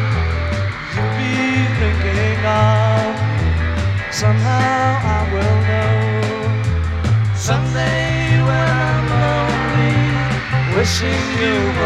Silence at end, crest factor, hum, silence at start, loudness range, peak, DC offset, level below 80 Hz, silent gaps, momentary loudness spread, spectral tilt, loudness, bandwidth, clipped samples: 0 s; 14 dB; none; 0 s; 1 LU; -2 dBFS; under 0.1%; -28 dBFS; none; 4 LU; -6 dB/octave; -17 LUFS; 11.5 kHz; under 0.1%